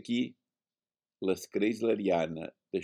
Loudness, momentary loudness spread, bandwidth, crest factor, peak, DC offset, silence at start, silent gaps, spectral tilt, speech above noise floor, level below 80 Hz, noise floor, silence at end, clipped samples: -32 LUFS; 9 LU; 16.5 kHz; 16 dB; -16 dBFS; under 0.1%; 0.05 s; none; -5.5 dB/octave; over 59 dB; -72 dBFS; under -90 dBFS; 0 s; under 0.1%